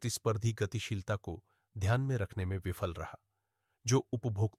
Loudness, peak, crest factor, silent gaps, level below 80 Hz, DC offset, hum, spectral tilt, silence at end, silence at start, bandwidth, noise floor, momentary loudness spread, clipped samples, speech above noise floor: -35 LUFS; -16 dBFS; 18 dB; none; -58 dBFS; under 0.1%; none; -5.5 dB/octave; 0.1 s; 0 s; 15 kHz; -83 dBFS; 13 LU; under 0.1%; 49 dB